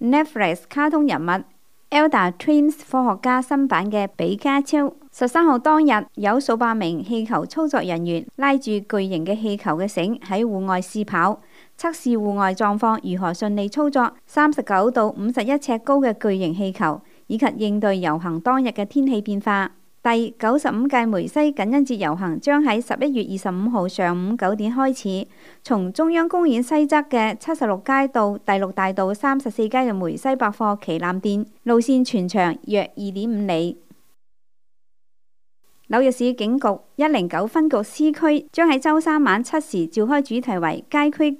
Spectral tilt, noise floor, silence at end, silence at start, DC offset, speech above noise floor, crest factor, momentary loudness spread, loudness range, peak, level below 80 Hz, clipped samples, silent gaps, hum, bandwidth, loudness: -6 dB/octave; -87 dBFS; 0.05 s; 0 s; 0.3%; 67 dB; 16 dB; 6 LU; 3 LU; -4 dBFS; -72 dBFS; under 0.1%; none; none; 15 kHz; -20 LUFS